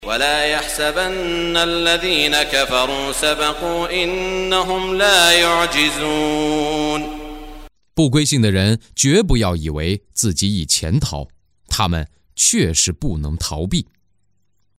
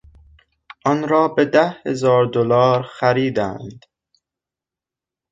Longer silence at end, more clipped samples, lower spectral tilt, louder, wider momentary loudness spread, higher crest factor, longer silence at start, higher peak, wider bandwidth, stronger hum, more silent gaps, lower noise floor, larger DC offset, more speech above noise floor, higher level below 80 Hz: second, 0.95 s vs 1.55 s; neither; second, -3.5 dB/octave vs -6.5 dB/octave; about the same, -17 LUFS vs -18 LUFS; about the same, 10 LU vs 9 LU; about the same, 18 dB vs 18 dB; second, 0 s vs 0.85 s; about the same, 0 dBFS vs -2 dBFS; first, 16 kHz vs 7.8 kHz; neither; neither; second, -68 dBFS vs -88 dBFS; neither; second, 51 dB vs 71 dB; first, -32 dBFS vs -56 dBFS